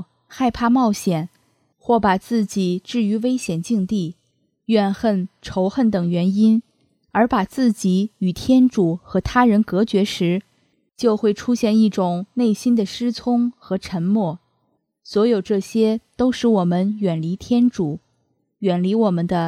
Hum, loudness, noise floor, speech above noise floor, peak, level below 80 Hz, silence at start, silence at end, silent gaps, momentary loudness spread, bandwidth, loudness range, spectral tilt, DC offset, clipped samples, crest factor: none; -19 LUFS; -69 dBFS; 50 dB; -2 dBFS; -48 dBFS; 0 s; 0 s; none; 8 LU; 14 kHz; 3 LU; -6.5 dB/octave; under 0.1%; under 0.1%; 16 dB